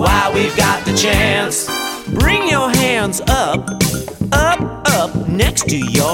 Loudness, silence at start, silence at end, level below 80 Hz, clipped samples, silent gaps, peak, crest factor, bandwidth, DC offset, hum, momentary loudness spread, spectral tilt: -15 LUFS; 0 s; 0 s; -26 dBFS; under 0.1%; none; 0 dBFS; 14 dB; 17 kHz; under 0.1%; none; 5 LU; -4 dB/octave